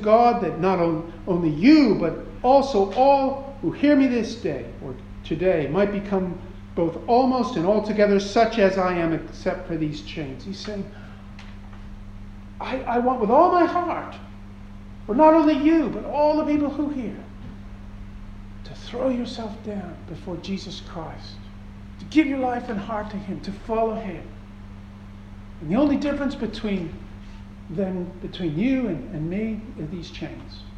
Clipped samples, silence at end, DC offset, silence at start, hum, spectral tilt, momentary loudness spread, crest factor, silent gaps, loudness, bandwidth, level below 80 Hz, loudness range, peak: under 0.1%; 0 s; under 0.1%; 0 s; none; -7 dB/octave; 24 LU; 20 dB; none; -22 LUFS; 8.6 kHz; -42 dBFS; 11 LU; -4 dBFS